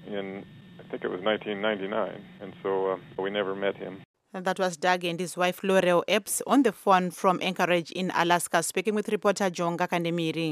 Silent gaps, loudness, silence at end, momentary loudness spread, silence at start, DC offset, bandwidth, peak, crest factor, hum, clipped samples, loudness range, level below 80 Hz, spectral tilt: 4.05-4.14 s; -27 LUFS; 0 s; 12 LU; 0 s; under 0.1%; 15.5 kHz; -8 dBFS; 20 dB; none; under 0.1%; 6 LU; -74 dBFS; -4 dB/octave